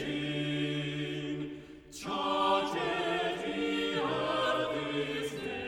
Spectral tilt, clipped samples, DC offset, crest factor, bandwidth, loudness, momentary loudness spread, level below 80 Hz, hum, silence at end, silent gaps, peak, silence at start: -5 dB/octave; under 0.1%; under 0.1%; 16 dB; 16.5 kHz; -32 LUFS; 8 LU; -62 dBFS; none; 0 s; none; -16 dBFS; 0 s